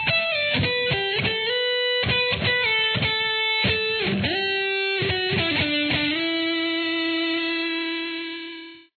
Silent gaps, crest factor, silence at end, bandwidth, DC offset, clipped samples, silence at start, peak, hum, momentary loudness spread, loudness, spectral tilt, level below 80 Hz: none; 14 dB; 0.2 s; 4.6 kHz; under 0.1%; under 0.1%; 0 s; -8 dBFS; none; 5 LU; -22 LUFS; -7 dB/octave; -50 dBFS